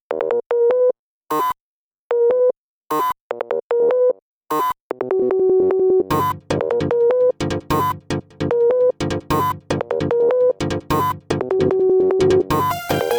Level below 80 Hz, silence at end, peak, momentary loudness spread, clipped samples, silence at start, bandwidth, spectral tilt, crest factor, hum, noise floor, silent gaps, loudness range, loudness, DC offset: -46 dBFS; 0 s; -4 dBFS; 9 LU; under 0.1%; 0.1 s; over 20 kHz; -6.5 dB/octave; 14 dB; none; under -90 dBFS; 0.46-0.50 s, 0.99-1.21 s, 1.61-2.10 s, 2.57-2.82 s, 3.21-3.30 s, 3.63-3.70 s, 4.22-4.41 s, 4.80-4.90 s; 2 LU; -19 LUFS; under 0.1%